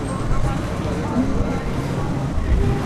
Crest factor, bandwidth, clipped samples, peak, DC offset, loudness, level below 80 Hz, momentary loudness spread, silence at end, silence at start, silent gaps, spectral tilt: 12 dB; 13 kHz; under 0.1%; -8 dBFS; under 0.1%; -23 LUFS; -24 dBFS; 3 LU; 0 s; 0 s; none; -7 dB/octave